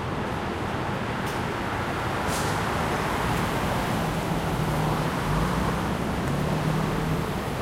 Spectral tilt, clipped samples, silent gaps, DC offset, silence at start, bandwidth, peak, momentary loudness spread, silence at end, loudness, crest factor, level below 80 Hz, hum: -5.5 dB/octave; under 0.1%; none; under 0.1%; 0 s; 16 kHz; -12 dBFS; 3 LU; 0 s; -27 LUFS; 14 dB; -38 dBFS; none